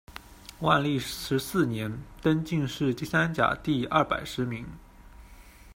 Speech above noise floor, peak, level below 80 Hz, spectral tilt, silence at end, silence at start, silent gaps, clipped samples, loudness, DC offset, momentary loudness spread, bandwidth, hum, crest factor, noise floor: 23 dB; -8 dBFS; -52 dBFS; -5.5 dB/octave; 0.05 s; 0.1 s; none; under 0.1%; -28 LUFS; under 0.1%; 13 LU; 16 kHz; none; 22 dB; -50 dBFS